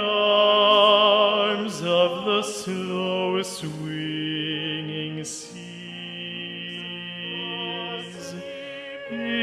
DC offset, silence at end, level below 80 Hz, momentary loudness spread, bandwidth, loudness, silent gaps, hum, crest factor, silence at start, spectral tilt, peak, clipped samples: under 0.1%; 0 s; -70 dBFS; 19 LU; 13.5 kHz; -23 LUFS; none; none; 18 dB; 0 s; -4 dB/octave; -6 dBFS; under 0.1%